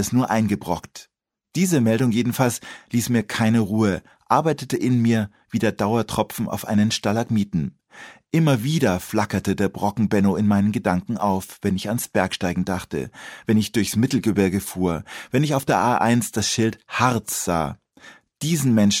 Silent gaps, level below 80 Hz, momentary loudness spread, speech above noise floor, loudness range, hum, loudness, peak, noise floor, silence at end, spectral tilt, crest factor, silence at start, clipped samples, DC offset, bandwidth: none; -52 dBFS; 8 LU; 28 dB; 2 LU; none; -22 LUFS; -2 dBFS; -49 dBFS; 0 s; -5.5 dB/octave; 20 dB; 0 s; under 0.1%; under 0.1%; 16.5 kHz